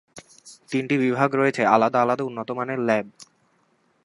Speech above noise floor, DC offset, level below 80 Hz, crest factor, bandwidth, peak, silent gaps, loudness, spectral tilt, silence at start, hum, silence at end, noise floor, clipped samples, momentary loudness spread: 43 dB; under 0.1%; -72 dBFS; 22 dB; 11.5 kHz; -2 dBFS; none; -22 LUFS; -6.5 dB/octave; 0.15 s; none; 0.8 s; -65 dBFS; under 0.1%; 10 LU